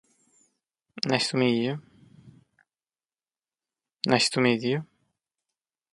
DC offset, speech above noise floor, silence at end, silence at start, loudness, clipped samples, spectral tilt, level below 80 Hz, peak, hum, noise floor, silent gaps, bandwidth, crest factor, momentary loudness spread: under 0.1%; over 66 dB; 1.1 s; 0.95 s; -25 LUFS; under 0.1%; -4.5 dB/octave; -70 dBFS; -4 dBFS; none; under -90 dBFS; none; 11.5 kHz; 26 dB; 10 LU